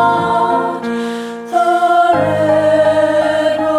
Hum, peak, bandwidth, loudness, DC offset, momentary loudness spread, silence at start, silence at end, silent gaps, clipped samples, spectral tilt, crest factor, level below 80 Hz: none; -2 dBFS; 13 kHz; -13 LUFS; under 0.1%; 8 LU; 0 s; 0 s; none; under 0.1%; -6 dB/octave; 10 dB; -50 dBFS